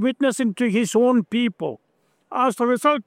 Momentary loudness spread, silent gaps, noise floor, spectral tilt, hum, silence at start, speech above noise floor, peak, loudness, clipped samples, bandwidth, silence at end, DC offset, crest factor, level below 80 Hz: 10 LU; none; -46 dBFS; -5 dB/octave; none; 0 s; 26 dB; -6 dBFS; -21 LUFS; under 0.1%; 15 kHz; 0.05 s; under 0.1%; 16 dB; -72 dBFS